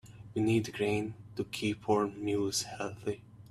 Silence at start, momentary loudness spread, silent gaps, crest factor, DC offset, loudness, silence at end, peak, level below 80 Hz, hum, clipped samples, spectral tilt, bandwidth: 0.05 s; 10 LU; none; 18 dB; under 0.1%; -33 LUFS; 0 s; -16 dBFS; -64 dBFS; none; under 0.1%; -5 dB/octave; 14.5 kHz